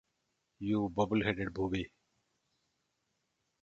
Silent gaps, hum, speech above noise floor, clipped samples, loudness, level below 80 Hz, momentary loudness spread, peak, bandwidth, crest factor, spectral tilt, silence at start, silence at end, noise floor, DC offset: none; none; 49 dB; under 0.1%; -34 LUFS; -58 dBFS; 9 LU; -16 dBFS; 7.6 kHz; 22 dB; -7 dB/octave; 0.6 s; 1.75 s; -82 dBFS; under 0.1%